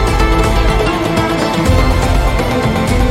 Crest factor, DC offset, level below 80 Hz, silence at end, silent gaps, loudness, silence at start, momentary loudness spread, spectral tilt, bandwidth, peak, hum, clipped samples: 10 dB; under 0.1%; -16 dBFS; 0 s; none; -13 LUFS; 0 s; 2 LU; -5.5 dB/octave; 16 kHz; 0 dBFS; none; under 0.1%